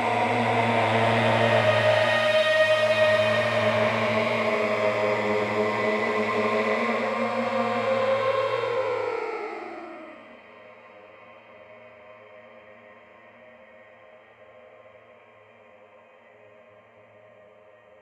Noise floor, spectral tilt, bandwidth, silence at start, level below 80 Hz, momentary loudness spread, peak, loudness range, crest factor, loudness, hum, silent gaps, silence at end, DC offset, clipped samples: -53 dBFS; -5.5 dB/octave; 12 kHz; 0 s; -66 dBFS; 9 LU; -8 dBFS; 14 LU; 18 dB; -23 LUFS; none; none; 5.1 s; under 0.1%; under 0.1%